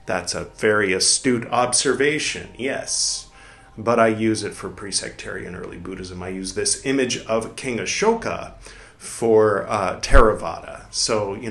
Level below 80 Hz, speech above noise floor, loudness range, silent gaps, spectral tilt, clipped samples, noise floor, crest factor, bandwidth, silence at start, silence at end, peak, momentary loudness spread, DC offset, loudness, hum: -32 dBFS; 25 dB; 5 LU; none; -3 dB/octave; under 0.1%; -46 dBFS; 22 dB; 12.5 kHz; 0.05 s; 0 s; 0 dBFS; 15 LU; under 0.1%; -21 LUFS; none